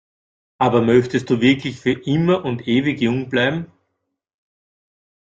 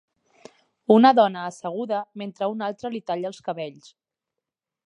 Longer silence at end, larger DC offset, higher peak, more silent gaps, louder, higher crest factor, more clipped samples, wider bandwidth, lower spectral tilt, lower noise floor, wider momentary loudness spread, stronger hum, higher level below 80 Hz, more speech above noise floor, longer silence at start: first, 1.65 s vs 1.15 s; neither; about the same, -2 dBFS vs -2 dBFS; neither; first, -18 LUFS vs -23 LUFS; about the same, 18 dB vs 22 dB; neither; second, 7.8 kHz vs 10.5 kHz; about the same, -7 dB/octave vs -6 dB/octave; second, -75 dBFS vs -86 dBFS; second, 6 LU vs 17 LU; neither; first, -56 dBFS vs -78 dBFS; second, 58 dB vs 64 dB; second, 0.6 s vs 0.9 s